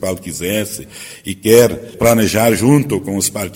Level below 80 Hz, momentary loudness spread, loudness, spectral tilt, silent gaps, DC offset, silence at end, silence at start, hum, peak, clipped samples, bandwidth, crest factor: -42 dBFS; 16 LU; -14 LUFS; -5 dB/octave; none; under 0.1%; 0 s; 0 s; none; 0 dBFS; 0.1%; 18 kHz; 14 dB